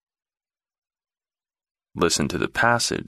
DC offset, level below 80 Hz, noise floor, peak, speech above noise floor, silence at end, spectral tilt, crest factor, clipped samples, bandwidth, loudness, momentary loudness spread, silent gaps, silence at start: under 0.1%; -50 dBFS; under -90 dBFS; -4 dBFS; over 68 dB; 0.05 s; -3 dB/octave; 22 dB; under 0.1%; 15 kHz; -22 LUFS; 5 LU; none; 1.95 s